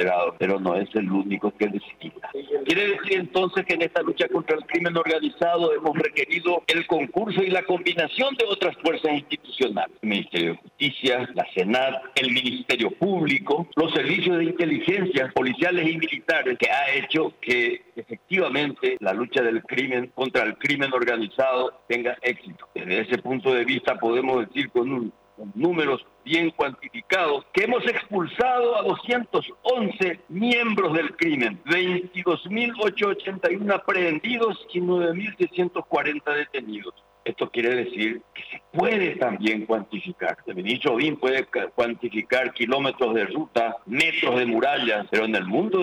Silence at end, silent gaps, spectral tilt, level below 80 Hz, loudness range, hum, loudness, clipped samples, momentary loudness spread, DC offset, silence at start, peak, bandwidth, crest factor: 0 s; none; -5.5 dB/octave; -66 dBFS; 3 LU; none; -23 LUFS; under 0.1%; 6 LU; under 0.1%; 0 s; -10 dBFS; 12.5 kHz; 12 dB